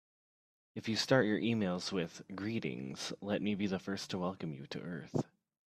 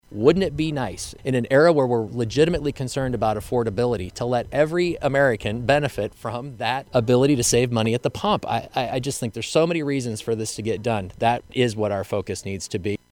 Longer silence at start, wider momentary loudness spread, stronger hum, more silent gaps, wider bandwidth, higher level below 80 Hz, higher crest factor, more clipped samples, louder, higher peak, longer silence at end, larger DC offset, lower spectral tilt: first, 0.75 s vs 0.1 s; first, 13 LU vs 9 LU; neither; neither; second, 14 kHz vs 18.5 kHz; second, -74 dBFS vs -46 dBFS; first, 24 dB vs 18 dB; neither; second, -37 LUFS vs -22 LUFS; second, -14 dBFS vs -4 dBFS; first, 0.45 s vs 0.15 s; neither; about the same, -5 dB/octave vs -5 dB/octave